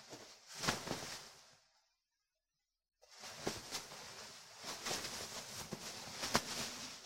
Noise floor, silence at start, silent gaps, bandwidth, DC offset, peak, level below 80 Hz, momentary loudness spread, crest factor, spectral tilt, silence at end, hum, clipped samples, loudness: under -90 dBFS; 0 s; none; 16 kHz; under 0.1%; -12 dBFS; -70 dBFS; 16 LU; 36 dB; -2 dB/octave; 0 s; none; under 0.1%; -43 LUFS